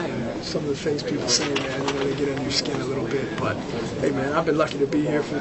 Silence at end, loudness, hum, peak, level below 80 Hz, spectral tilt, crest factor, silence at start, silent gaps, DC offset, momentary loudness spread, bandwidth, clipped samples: 0 s; -24 LUFS; none; -6 dBFS; -48 dBFS; -4.5 dB/octave; 18 dB; 0 s; none; under 0.1%; 6 LU; 8.4 kHz; under 0.1%